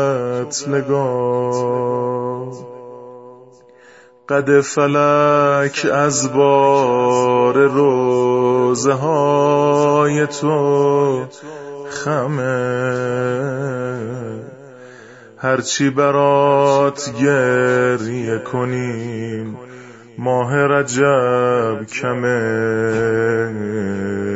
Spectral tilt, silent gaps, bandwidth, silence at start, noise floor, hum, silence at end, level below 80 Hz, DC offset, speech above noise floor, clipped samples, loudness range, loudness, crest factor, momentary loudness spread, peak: -5.5 dB/octave; none; 8 kHz; 0 s; -46 dBFS; none; 0 s; -58 dBFS; under 0.1%; 30 dB; under 0.1%; 7 LU; -16 LUFS; 16 dB; 13 LU; -2 dBFS